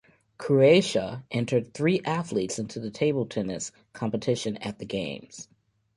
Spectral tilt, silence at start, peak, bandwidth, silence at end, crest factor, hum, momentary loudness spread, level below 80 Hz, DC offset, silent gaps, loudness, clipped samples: -5.5 dB/octave; 0.4 s; -6 dBFS; 11.5 kHz; 0.55 s; 20 dB; none; 15 LU; -62 dBFS; under 0.1%; none; -26 LUFS; under 0.1%